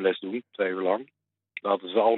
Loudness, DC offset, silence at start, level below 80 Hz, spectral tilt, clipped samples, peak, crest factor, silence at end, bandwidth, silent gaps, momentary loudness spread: -28 LUFS; under 0.1%; 0 s; -88 dBFS; -8.5 dB/octave; under 0.1%; -10 dBFS; 18 dB; 0 s; 4.2 kHz; none; 9 LU